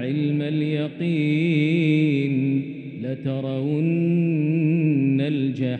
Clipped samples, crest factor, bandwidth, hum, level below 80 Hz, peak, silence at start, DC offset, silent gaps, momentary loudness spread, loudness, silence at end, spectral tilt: under 0.1%; 12 dB; 8.2 kHz; none; -68 dBFS; -10 dBFS; 0 s; under 0.1%; none; 7 LU; -22 LUFS; 0 s; -9.5 dB/octave